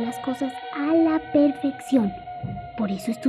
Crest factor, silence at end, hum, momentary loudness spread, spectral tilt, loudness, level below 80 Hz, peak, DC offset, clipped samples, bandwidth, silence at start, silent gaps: 16 dB; 0 s; none; 13 LU; -6.5 dB/octave; -24 LUFS; -54 dBFS; -8 dBFS; under 0.1%; under 0.1%; 13 kHz; 0 s; none